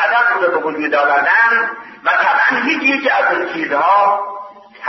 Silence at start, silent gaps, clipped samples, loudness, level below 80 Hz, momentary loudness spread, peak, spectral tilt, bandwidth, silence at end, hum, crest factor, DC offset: 0 s; none; under 0.1%; -14 LUFS; -70 dBFS; 9 LU; -2 dBFS; -4 dB/octave; 6.2 kHz; 0 s; none; 12 dB; under 0.1%